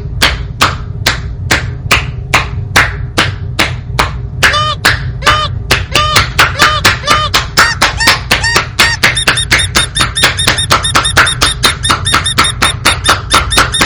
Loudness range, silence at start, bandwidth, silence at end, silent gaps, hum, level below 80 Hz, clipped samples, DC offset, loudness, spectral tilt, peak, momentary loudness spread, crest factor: 4 LU; 0 s; over 20 kHz; 0 s; none; none; -24 dBFS; 2%; under 0.1%; -9 LUFS; -2.5 dB/octave; 0 dBFS; 6 LU; 10 dB